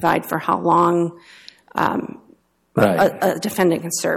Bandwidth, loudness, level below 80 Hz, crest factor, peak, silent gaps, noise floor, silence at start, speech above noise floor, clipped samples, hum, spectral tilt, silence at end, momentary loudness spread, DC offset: 17 kHz; -19 LUFS; -58 dBFS; 16 dB; -4 dBFS; none; -55 dBFS; 0 s; 36 dB; under 0.1%; none; -5 dB/octave; 0 s; 10 LU; under 0.1%